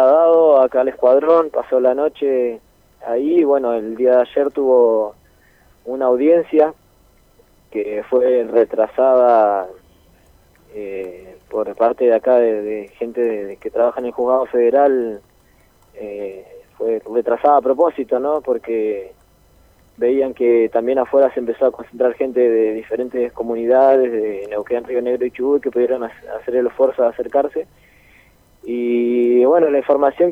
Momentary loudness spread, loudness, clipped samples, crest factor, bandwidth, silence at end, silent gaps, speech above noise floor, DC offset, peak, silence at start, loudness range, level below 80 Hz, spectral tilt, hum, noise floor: 14 LU; -17 LUFS; under 0.1%; 16 dB; 4.2 kHz; 0 s; none; 37 dB; under 0.1%; 0 dBFS; 0 s; 3 LU; -56 dBFS; -7.5 dB/octave; none; -53 dBFS